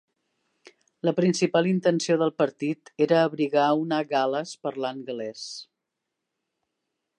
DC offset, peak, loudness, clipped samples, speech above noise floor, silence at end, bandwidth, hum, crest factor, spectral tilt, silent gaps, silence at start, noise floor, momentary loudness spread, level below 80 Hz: under 0.1%; -8 dBFS; -25 LUFS; under 0.1%; 59 dB; 1.55 s; 11 kHz; none; 18 dB; -5.5 dB/octave; none; 1.05 s; -83 dBFS; 12 LU; -78 dBFS